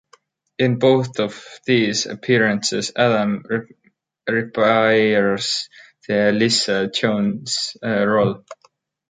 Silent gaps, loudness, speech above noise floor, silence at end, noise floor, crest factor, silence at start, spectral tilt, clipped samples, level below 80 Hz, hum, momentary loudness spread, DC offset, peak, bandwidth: none; -19 LUFS; 41 dB; 0.55 s; -59 dBFS; 18 dB; 0.6 s; -4.5 dB/octave; under 0.1%; -60 dBFS; none; 10 LU; under 0.1%; -2 dBFS; 9.6 kHz